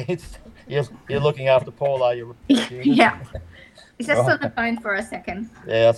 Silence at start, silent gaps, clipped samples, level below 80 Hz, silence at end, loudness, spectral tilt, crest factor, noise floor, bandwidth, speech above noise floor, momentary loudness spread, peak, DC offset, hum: 0 s; none; under 0.1%; -50 dBFS; 0 s; -21 LUFS; -6 dB/octave; 22 dB; -47 dBFS; 12.5 kHz; 26 dB; 14 LU; 0 dBFS; under 0.1%; none